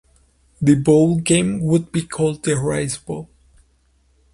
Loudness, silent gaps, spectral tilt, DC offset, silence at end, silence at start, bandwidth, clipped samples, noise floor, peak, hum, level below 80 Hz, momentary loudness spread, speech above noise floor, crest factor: -18 LUFS; none; -6 dB/octave; under 0.1%; 1.1 s; 0.6 s; 11.5 kHz; under 0.1%; -59 dBFS; -2 dBFS; none; -48 dBFS; 11 LU; 42 dB; 18 dB